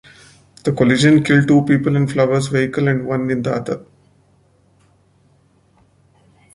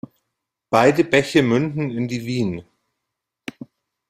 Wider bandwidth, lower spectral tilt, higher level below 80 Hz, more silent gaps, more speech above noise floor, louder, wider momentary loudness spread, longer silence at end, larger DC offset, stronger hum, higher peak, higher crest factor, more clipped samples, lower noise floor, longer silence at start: second, 11.5 kHz vs 15.5 kHz; about the same, -6.5 dB/octave vs -6 dB/octave; about the same, -52 dBFS vs -56 dBFS; neither; second, 41 dB vs 63 dB; first, -16 LUFS vs -19 LUFS; second, 11 LU vs 20 LU; first, 2.75 s vs 1.45 s; neither; neither; about the same, -2 dBFS vs -2 dBFS; about the same, 16 dB vs 20 dB; neither; second, -56 dBFS vs -81 dBFS; about the same, 0.65 s vs 0.7 s